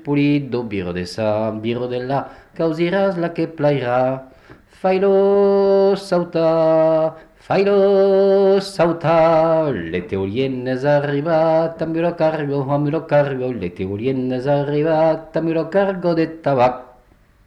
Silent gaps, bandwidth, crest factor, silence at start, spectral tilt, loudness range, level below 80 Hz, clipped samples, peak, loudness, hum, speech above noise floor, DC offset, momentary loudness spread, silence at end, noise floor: none; 11.5 kHz; 12 dB; 0.05 s; -8 dB/octave; 5 LU; -52 dBFS; under 0.1%; -6 dBFS; -18 LUFS; none; 35 dB; under 0.1%; 9 LU; 0.6 s; -52 dBFS